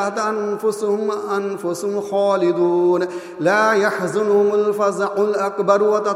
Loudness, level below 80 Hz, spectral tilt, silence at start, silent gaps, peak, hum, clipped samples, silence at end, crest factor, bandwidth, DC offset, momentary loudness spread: -19 LUFS; -72 dBFS; -5.5 dB/octave; 0 s; none; -2 dBFS; none; under 0.1%; 0 s; 18 dB; 13.5 kHz; under 0.1%; 7 LU